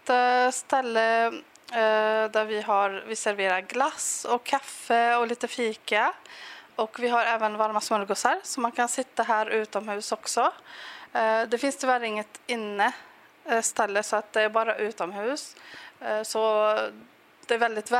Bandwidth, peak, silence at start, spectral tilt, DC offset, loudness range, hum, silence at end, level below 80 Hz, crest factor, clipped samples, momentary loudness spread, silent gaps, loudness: 16 kHz; -6 dBFS; 0.05 s; -1.5 dB/octave; under 0.1%; 2 LU; none; 0 s; -84 dBFS; 20 dB; under 0.1%; 9 LU; none; -26 LUFS